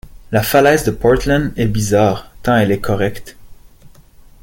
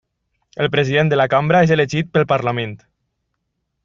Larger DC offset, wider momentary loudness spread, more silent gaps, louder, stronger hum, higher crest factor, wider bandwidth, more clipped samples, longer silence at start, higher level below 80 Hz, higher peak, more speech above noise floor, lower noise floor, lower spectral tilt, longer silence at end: neither; about the same, 8 LU vs 10 LU; neither; about the same, -15 LUFS vs -16 LUFS; neither; about the same, 16 dB vs 16 dB; first, 17 kHz vs 7.4 kHz; neither; second, 0.25 s vs 0.55 s; first, -32 dBFS vs -54 dBFS; about the same, 0 dBFS vs -2 dBFS; second, 29 dB vs 57 dB; second, -42 dBFS vs -73 dBFS; about the same, -5.5 dB/octave vs -6.5 dB/octave; second, 0.55 s vs 1.1 s